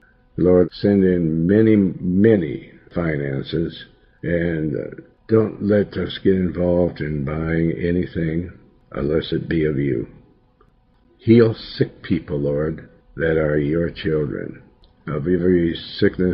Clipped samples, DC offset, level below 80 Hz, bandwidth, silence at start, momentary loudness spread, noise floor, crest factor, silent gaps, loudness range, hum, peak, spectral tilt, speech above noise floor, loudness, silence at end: under 0.1%; under 0.1%; -44 dBFS; 5.6 kHz; 0.35 s; 13 LU; -56 dBFS; 18 dB; none; 5 LU; none; 0 dBFS; -11.5 dB/octave; 38 dB; -20 LUFS; 0 s